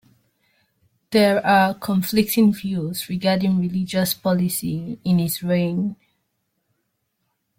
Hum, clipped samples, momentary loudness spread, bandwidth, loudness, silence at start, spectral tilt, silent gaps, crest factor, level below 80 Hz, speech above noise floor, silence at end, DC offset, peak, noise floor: none; under 0.1%; 9 LU; 16.5 kHz; -20 LUFS; 1.1 s; -5.5 dB/octave; none; 18 dB; -56 dBFS; 54 dB; 1.65 s; under 0.1%; -4 dBFS; -73 dBFS